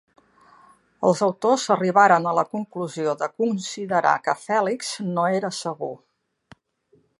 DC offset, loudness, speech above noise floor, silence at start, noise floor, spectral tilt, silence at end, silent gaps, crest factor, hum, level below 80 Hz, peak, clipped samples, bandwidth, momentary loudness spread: under 0.1%; -22 LUFS; 41 dB; 1 s; -63 dBFS; -4.5 dB/octave; 1.25 s; none; 20 dB; none; -74 dBFS; -2 dBFS; under 0.1%; 11.5 kHz; 13 LU